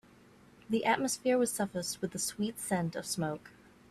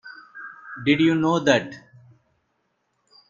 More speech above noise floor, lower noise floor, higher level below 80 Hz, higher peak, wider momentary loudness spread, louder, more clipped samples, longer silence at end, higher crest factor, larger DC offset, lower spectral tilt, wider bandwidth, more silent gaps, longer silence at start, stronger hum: second, 27 dB vs 52 dB; second, -60 dBFS vs -72 dBFS; second, -68 dBFS vs -62 dBFS; second, -16 dBFS vs -4 dBFS; second, 7 LU vs 21 LU; second, -33 LUFS vs -20 LUFS; neither; second, 0.4 s vs 1.5 s; about the same, 20 dB vs 22 dB; neither; second, -4 dB/octave vs -5.5 dB/octave; first, 15.5 kHz vs 7.4 kHz; neither; first, 0.7 s vs 0.05 s; neither